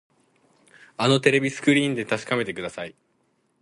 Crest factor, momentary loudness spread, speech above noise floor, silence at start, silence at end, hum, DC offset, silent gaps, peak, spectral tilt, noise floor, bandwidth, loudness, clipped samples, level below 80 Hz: 22 dB; 17 LU; 46 dB; 1 s; 0.7 s; none; under 0.1%; none; -4 dBFS; -5 dB/octave; -68 dBFS; 11.5 kHz; -22 LUFS; under 0.1%; -66 dBFS